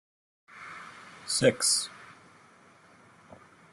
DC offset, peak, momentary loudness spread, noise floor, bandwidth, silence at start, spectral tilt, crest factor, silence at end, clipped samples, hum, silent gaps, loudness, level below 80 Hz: under 0.1%; -8 dBFS; 23 LU; -58 dBFS; 12.5 kHz; 0.55 s; -2.5 dB/octave; 24 dB; 1.65 s; under 0.1%; none; none; -26 LUFS; -70 dBFS